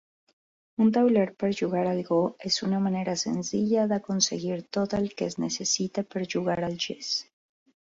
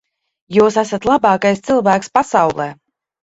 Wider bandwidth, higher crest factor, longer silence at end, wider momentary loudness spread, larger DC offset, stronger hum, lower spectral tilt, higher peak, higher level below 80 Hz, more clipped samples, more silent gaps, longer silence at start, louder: about the same, 7.8 kHz vs 8 kHz; about the same, 18 dB vs 16 dB; first, 0.7 s vs 0.55 s; about the same, 7 LU vs 5 LU; neither; neither; about the same, -4.5 dB/octave vs -5.5 dB/octave; second, -8 dBFS vs 0 dBFS; second, -64 dBFS vs -52 dBFS; neither; neither; first, 0.8 s vs 0.5 s; second, -27 LUFS vs -15 LUFS